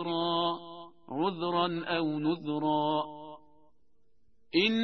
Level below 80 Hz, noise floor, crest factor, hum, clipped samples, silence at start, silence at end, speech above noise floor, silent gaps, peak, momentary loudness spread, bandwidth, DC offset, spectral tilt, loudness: -70 dBFS; -73 dBFS; 18 dB; none; under 0.1%; 0 s; 0 s; 44 dB; none; -14 dBFS; 15 LU; 6.4 kHz; 0.1%; -7 dB/octave; -31 LUFS